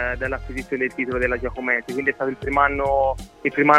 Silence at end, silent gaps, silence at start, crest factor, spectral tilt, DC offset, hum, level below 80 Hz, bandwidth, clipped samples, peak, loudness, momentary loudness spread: 0 s; none; 0 s; 22 dB; -6.5 dB/octave; under 0.1%; none; -38 dBFS; 14.5 kHz; under 0.1%; 0 dBFS; -23 LUFS; 7 LU